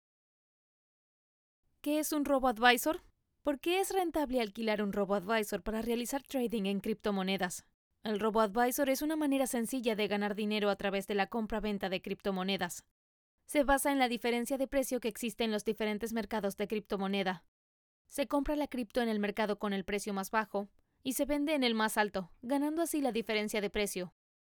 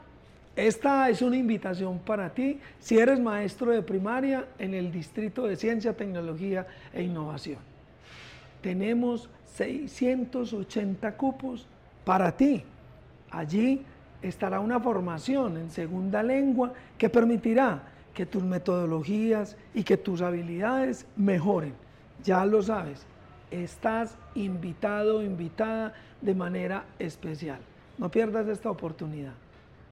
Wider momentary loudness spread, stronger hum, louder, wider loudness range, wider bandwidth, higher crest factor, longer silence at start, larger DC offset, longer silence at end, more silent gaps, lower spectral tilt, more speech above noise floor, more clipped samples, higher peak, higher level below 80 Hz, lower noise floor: second, 7 LU vs 14 LU; neither; second, -33 LUFS vs -29 LUFS; second, 3 LU vs 6 LU; first, over 20 kHz vs 11.5 kHz; first, 24 dB vs 16 dB; first, 1.85 s vs 0.55 s; neither; about the same, 0.4 s vs 0.5 s; first, 7.74-7.91 s, 12.91-13.38 s, 17.48-18.05 s vs none; second, -4 dB/octave vs -7 dB/octave; first, over 57 dB vs 25 dB; neither; about the same, -10 dBFS vs -12 dBFS; about the same, -56 dBFS vs -58 dBFS; first, under -90 dBFS vs -53 dBFS